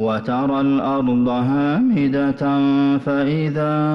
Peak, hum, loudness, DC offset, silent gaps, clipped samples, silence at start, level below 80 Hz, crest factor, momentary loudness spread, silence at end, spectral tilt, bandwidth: -10 dBFS; none; -18 LUFS; under 0.1%; none; under 0.1%; 0 s; -52 dBFS; 6 dB; 3 LU; 0 s; -9 dB/octave; 5.8 kHz